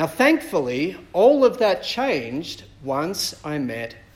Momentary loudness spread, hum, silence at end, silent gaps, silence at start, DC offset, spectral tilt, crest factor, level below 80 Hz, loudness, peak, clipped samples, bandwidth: 13 LU; none; 0.15 s; none; 0 s; under 0.1%; -4.5 dB/octave; 18 dB; -54 dBFS; -21 LUFS; -4 dBFS; under 0.1%; 16.5 kHz